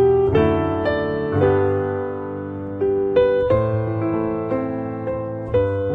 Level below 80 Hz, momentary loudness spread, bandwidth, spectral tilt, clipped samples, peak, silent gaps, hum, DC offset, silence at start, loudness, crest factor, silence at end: -40 dBFS; 9 LU; 4.8 kHz; -10 dB/octave; under 0.1%; -6 dBFS; none; none; under 0.1%; 0 s; -21 LUFS; 14 dB; 0 s